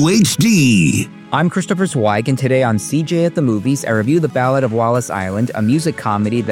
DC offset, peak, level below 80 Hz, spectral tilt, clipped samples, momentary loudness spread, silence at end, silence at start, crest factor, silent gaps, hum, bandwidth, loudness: under 0.1%; -2 dBFS; -52 dBFS; -5.5 dB/octave; under 0.1%; 6 LU; 0 s; 0 s; 14 dB; none; none; 17 kHz; -15 LUFS